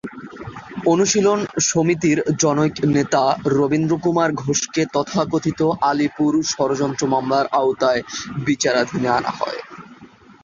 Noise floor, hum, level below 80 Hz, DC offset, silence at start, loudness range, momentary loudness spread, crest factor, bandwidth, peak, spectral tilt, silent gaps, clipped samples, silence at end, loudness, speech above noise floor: -45 dBFS; none; -54 dBFS; under 0.1%; 0.05 s; 2 LU; 9 LU; 16 dB; 7.6 kHz; -4 dBFS; -4.5 dB/octave; none; under 0.1%; 0.35 s; -19 LUFS; 27 dB